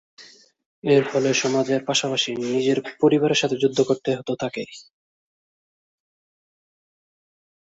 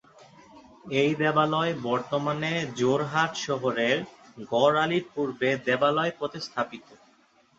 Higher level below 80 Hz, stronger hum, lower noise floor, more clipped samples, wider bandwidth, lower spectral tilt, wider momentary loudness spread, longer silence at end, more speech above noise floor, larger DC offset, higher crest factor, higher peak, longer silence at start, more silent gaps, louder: about the same, -66 dBFS vs -68 dBFS; neither; first, under -90 dBFS vs -62 dBFS; neither; about the same, 8 kHz vs 8 kHz; about the same, -4 dB/octave vs -5 dB/octave; about the same, 9 LU vs 9 LU; first, 2.95 s vs 0.65 s; first, over 69 dB vs 36 dB; neither; about the same, 20 dB vs 20 dB; about the same, -6 dBFS vs -8 dBFS; second, 0.2 s vs 0.55 s; first, 0.66-0.82 s vs none; first, -21 LUFS vs -26 LUFS